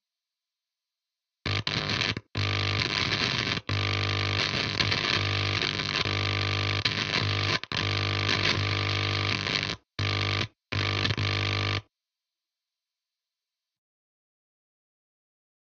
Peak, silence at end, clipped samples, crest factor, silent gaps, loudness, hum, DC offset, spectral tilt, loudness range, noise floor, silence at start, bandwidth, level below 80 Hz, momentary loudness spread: -10 dBFS; 3.95 s; under 0.1%; 20 dB; none; -27 LUFS; none; under 0.1%; -4 dB/octave; 5 LU; -89 dBFS; 1.45 s; 7.8 kHz; -52 dBFS; 5 LU